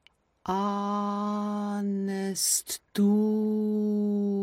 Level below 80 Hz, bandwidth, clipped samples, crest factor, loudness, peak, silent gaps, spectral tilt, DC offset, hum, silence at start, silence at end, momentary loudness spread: -70 dBFS; 16.5 kHz; under 0.1%; 16 dB; -28 LUFS; -12 dBFS; none; -5 dB/octave; under 0.1%; none; 0.45 s; 0 s; 6 LU